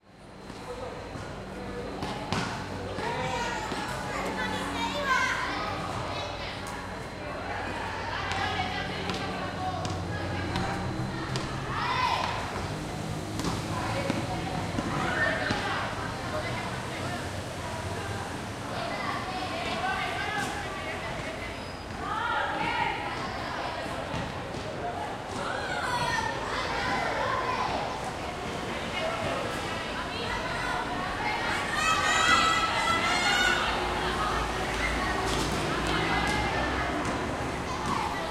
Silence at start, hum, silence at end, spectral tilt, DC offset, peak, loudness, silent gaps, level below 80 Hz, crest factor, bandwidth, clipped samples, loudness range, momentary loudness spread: 0.05 s; none; 0 s; -4 dB/octave; under 0.1%; -10 dBFS; -30 LUFS; none; -46 dBFS; 22 dB; 16.5 kHz; under 0.1%; 8 LU; 10 LU